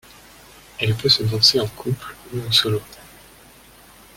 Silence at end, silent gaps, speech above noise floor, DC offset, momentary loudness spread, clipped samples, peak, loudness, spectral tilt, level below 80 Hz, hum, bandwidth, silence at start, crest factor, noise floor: 1.1 s; none; 27 dB; under 0.1%; 15 LU; under 0.1%; -2 dBFS; -18 LUFS; -4 dB/octave; -50 dBFS; none; 17 kHz; 0.8 s; 20 dB; -47 dBFS